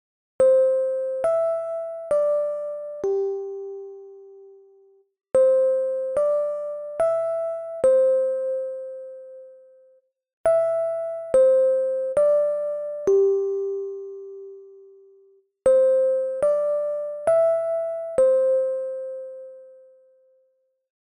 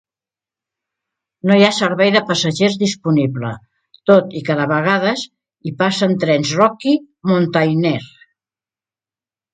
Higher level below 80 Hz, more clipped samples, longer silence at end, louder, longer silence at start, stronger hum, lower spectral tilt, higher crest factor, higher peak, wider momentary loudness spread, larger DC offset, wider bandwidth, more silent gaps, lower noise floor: about the same, -64 dBFS vs -60 dBFS; neither; about the same, 1.35 s vs 1.45 s; second, -22 LUFS vs -16 LUFS; second, 0.4 s vs 1.45 s; neither; about the same, -6 dB/octave vs -5.5 dB/octave; about the same, 14 dB vs 18 dB; second, -10 dBFS vs 0 dBFS; first, 18 LU vs 11 LU; neither; first, 11 kHz vs 9.4 kHz; first, 10.33-10.44 s vs none; second, -68 dBFS vs under -90 dBFS